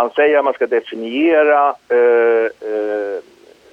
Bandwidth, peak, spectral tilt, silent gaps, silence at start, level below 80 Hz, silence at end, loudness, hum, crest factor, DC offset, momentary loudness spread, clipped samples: 5 kHz; -2 dBFS; -5 dB/octave; none; 0 s; -68 dBFS; 0.5 s; -15 LUFS; none; 14 dB; under 0.1%; 10 LU; under 0.1%